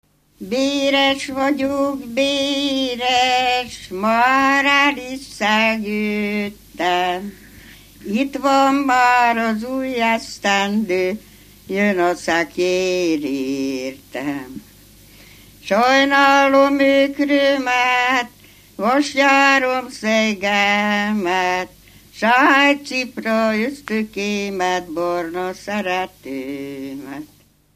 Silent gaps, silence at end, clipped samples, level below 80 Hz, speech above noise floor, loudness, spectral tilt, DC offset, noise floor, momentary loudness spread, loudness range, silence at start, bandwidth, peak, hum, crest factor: none; 0.5 s; under 0.1%; -54 dBFS; 28 dB; -17 LUFS; -3.5 dB/octave; under 0.1%; -46 dBFS; 14 LU; 6 LU; 0.4 s; 15 kHz; 0 dBFS; 50 Hz at -55 dBFS; 18 dB